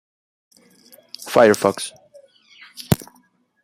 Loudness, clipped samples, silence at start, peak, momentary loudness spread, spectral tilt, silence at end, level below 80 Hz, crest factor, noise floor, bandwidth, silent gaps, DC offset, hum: -19 LUFS; under 0.1%; 1.2 s; 0 dBFS; 24 LU; -5 dB/octave; 0.6 s; -54 dBFS; 22 dB; -59 dBFS; 16 kHz; none; under 0.1%; none